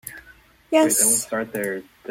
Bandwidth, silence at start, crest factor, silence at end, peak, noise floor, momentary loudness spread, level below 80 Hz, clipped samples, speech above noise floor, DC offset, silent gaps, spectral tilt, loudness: 16.5 kHz; 0.05 s; 18 dB; 0.3 s; -6 dBFS; -52 dBFS; 16 LU; -60 dBFS; under 0.1%; 31 dB; under 0.1%; none; -2 dB/octave; -20 LUFS